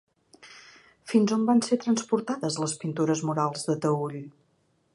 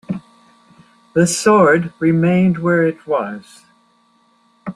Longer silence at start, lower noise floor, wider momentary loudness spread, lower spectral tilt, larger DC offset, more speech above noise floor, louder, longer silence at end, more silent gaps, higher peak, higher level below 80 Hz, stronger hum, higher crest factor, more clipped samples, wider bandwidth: first, 0.45 s vs 0.1 s; first, -69 dBFS vs -57 dBFS; first, 20 LU vs 17 LU; about the same, -5.5 dB/octave vs -6 dB/octave; neither; about the same, 43 dB vs 42 dB; second, -26 LUFS vs -15 LUFS; first, 0.65 s vs 0.05 s; neither; second, -10 dBFS vs -2 dBFS; second, -74 dBFS vs -56 dBFS; neither; about the same, 18 dB vs 16 dB; neither; second, 11.5 kHz vs 13.5 kHz